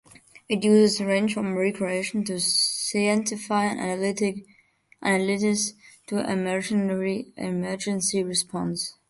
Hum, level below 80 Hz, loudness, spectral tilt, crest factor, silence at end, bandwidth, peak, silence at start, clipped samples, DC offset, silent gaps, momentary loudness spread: none; -66 dBFS; -25 LUFS; -4 dB/octave; 18 dB; 0.2 s; 12 kHz; -8 dBFS; 0.35 s; under 0.1%; under 0.1%; none; 8 LU